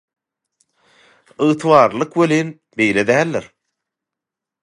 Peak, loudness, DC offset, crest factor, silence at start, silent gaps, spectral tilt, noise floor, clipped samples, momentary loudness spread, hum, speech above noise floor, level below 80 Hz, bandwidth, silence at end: 0 dBFS; -16 LUFS; under 0.1%; 18 dB; 1.4 s; none; -6 dB/octave; -85 dBFS; under 0.1%; 9 LU; none; 69 dB; -60 dBFS; 11.5 kHz; 1.2 s